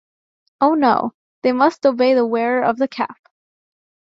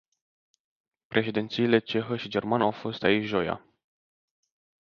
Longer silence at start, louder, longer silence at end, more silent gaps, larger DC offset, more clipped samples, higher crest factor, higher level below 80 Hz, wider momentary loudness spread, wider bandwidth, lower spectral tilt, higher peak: second, 0.6 s vs 1.1 s; first, -18 LUFS vs -27 LUFS; second, 1 s vs 1.3 s; first, 1.14-1.42 s vs none; neither; neither; second, 16 dB vs 24 dB; about the same, -64 dBFS vs -64 dBFS; about the same, 8 LU vs 6 LU; about the same, 7.6 kHz vs 7 kHz; about the same, -6 dB/octave vs -7 dB/octave; first, -2 dBFS vs -6 dBFS